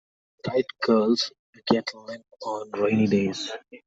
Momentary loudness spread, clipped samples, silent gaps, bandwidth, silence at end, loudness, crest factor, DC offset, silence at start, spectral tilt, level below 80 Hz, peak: 15 LU; under 0.1%; 1.39-1.53 s; 7.8 kHz; 0.1 s; -25 LUFS; 20 dB; under 0.1%; 0.45 s; -5.5 dB/octave; -66 dBFS; -4 dBFS